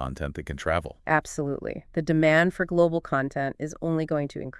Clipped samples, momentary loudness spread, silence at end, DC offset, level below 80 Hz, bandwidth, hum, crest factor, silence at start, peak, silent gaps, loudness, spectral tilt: under 0.1%; 12 LU; 0.1 s; under 0.1%; -46 dBFS; 12 kHz; none; 18 dB; 0 s; -6 dBFS; none; -26 LUFS; -6.5 dB/octave